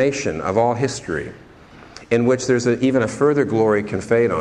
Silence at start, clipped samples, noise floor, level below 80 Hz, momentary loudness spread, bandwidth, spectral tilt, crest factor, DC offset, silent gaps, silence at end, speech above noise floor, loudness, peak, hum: 0 s; under 0.1%; -43 dBFS; -50 dBFS; 7 LU; 10.5 kHz; -6 dB/octave; 16 dB; under 0.1%; none; 0 s; 25 dB; -19 LUFS; -2 dBFS; none